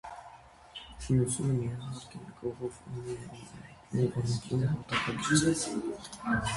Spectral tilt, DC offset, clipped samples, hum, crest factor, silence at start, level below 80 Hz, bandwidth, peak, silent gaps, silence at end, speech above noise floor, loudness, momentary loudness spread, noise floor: -5 dB/octave; under 0.1%; under 0.1%; none; 20 dB; 0.05 s; -54 dBFS; 11.5 kHz; -12 dBFS; none; 0 s; 21 dB; -32 LUFS; 19 LU; -53 dBFS